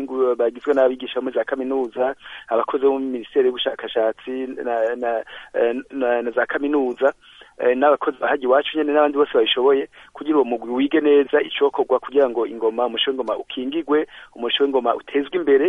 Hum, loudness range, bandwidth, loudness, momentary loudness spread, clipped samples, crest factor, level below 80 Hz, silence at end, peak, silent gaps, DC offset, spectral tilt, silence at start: none; 4 LU; 3.8 kHz; -20 LUFS; 8 LU; under 0.1%; 16 dB; -62 dBFS; 0 s; -4 dBFS; none; under 0.1%; -5.5 dB/octave; 0 s